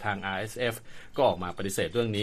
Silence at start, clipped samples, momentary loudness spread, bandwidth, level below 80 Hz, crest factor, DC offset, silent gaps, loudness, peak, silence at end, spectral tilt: 0 s; under 0.1%; 8 LU; 15 kHz; -54 dBFS; 18 dB; under 0.1%; none; -30 LUFS; -10 dBFS; 0 s; -4.5 dB/octave